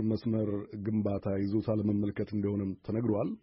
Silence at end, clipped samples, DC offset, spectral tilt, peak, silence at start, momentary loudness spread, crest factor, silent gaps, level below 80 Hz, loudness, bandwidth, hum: 0.05 s; under 0.1%; under 0.1%; -9.5 dB/octave; -18 dBFS; 0 s; 4 LU; 14 dB; none; -60 dBFS; -32 LUFS; 5.8 kHz; none